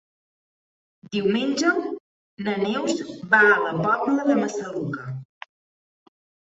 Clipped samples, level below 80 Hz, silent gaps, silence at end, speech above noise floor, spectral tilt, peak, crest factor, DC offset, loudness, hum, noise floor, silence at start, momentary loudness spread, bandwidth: under 0.1%; -68 dBFS; 2.00-2.37 s; 1.35 s; over 68 dB; -5 dB/octave; -4 dBFS; 20 dB; under 0.1%; -22 LUFS; none; under -90 dBFS; 1.1 s; 16 LU; 8 kHz